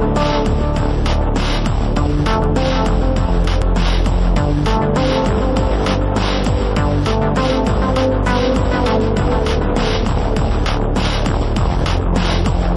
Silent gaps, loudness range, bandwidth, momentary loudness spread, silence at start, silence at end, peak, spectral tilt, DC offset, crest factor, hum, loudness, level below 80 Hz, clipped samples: none; 1 LU; 11 kHz; 2 LU; 0 s; 0 s; -2 dBFS; -6.5 dB/octave; under 0.1%; 14 dB; none; -17 LUFS; -18 dBFS; under 0.1%